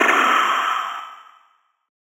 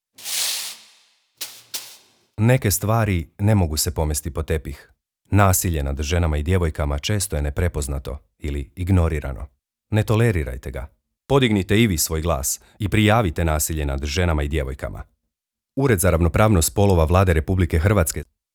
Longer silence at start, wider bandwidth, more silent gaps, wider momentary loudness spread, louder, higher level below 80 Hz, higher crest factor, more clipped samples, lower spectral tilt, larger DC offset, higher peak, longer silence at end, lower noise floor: second, 0 s vs 0.2 s; about the same, over 20 kHz vs over 20 kHz; neither; first, 18 LU vs 15 LU; first, -18 LUFS vs -21 LUFS; second, -84 dBFS vs -30 dBFS; about the same, 18 dB vs 20 dB; neither; second, -0.5 dB/octave vs -5 dB/octave; neither; second, -4 dBFS vs 0 dBFS; first, 0.95 s vs 0.3 s; second, -61 dBFS vs -84 dBFS